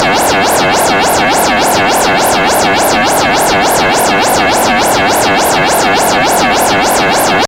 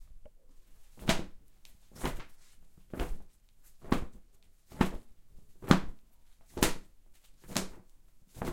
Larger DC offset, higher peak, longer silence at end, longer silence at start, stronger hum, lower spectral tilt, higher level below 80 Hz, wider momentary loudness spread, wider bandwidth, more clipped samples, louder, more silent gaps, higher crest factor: neither; about the same, 0 dBFS vs -2 dBFS; about the same, 0 s vs 0 s; about the same, 0 s vs 0 s; neither; second, -2.5 dB/octave vs -4.5 dB/octave; first, -34 dBFS vs -46 dBFS; second, 0 LU vs 24 LU; about the same, 16.5 kHz vs 16.5 kHz; neither; first, -8 LUFS vs -34 LUFS; neither; second, 8 dB vs 34 dB